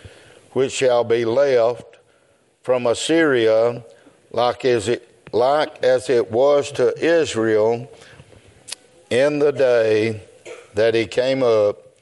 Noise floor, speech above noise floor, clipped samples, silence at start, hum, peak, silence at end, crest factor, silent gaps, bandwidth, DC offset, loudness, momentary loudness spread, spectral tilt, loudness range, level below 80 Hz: -59 dBFS; 41 dB; under 0.1%; 0.05 s; none; -6 dBFS; 0.25 s; 14 dB; none; 11.5 kHz; under 0.1%; -18 LUFS; 16 LU; -4.5 dB/octave; 2 LU; -64 dBFS